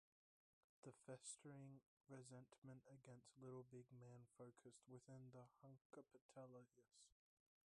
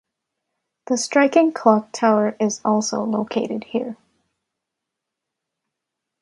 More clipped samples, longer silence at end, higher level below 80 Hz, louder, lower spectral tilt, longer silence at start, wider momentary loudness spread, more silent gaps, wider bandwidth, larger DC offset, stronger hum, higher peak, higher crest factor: neither; second, 0.55 s vs 2.25 s; second, under -90 dBFS vs -68 dBFS; second, -64 LUFS vs -20 LUFS; about the same, -5 dB/octave vs -4.5 dB/octave; about the same, 0.85 s vs 0.9 s; about the same, 8 LU vs 9 LU; first, 1.86-2.01 s, 2.58-2.62 s, 5.81-5.90 s, 6.21-6.29 s vs none; about the same, 11 kHz vs 11.5 kHz; neither; neither; second, -44 dBFS vs 0 dBFS; about the same, 20 dB vs 22 dB